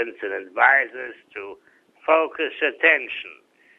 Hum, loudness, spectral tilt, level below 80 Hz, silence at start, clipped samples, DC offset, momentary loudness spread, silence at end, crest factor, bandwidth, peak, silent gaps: none; -20 LUFS; -3.5 dB/octave; -72 dBFS; 0 s; under 0.1%; under 0.1%; 20 LU; 0.45 s; 20 dB; 6.2 kHz; -2 dBFS; none